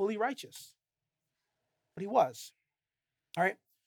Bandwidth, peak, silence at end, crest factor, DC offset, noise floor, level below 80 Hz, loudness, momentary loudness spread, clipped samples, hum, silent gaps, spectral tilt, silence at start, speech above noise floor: 18.5 kHz; -14 dBFS; 0.35 s; 22 dB; under 0.1%; under -90 dBFS; under -90 dBFS; -33 LUFS; 21 LU; under 0.1%; none; none; -4.5 dB/octave; 0 s; over 57 dB